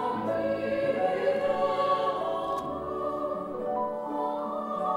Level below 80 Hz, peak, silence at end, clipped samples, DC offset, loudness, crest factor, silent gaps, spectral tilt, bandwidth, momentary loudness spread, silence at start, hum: -60 dBFS; -14 dBFS; 0 s; under 0.1%; under 0.1%; -29 LUFS; 14 dB; none; -6.5 dB/octave; 11.5 kHz; 6 LU; 0 s; none